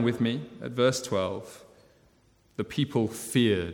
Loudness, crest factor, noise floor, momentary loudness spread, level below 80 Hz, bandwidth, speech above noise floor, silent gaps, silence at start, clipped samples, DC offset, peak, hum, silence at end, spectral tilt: -28 LUFS; 18 dB; -63 dBFS; 13 LU; -60 dBFS; 18 kHz; 36 dB; none; 0 s; under 0.1%; under 0.1%; -10 dBFS; none; 0 s; -5.5 dB/octave